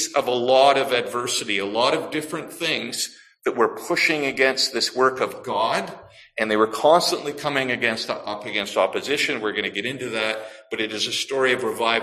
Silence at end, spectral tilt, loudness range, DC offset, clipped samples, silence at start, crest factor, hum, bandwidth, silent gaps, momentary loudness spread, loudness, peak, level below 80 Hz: 0 s; -2.5 dB/octave; 3 LU; under 0.1%; under 0.1%; 0 s; 20 dB; none; 15 kHz; none; 10 LU; -22 LUFS; -4 dBFS; -66 dBFS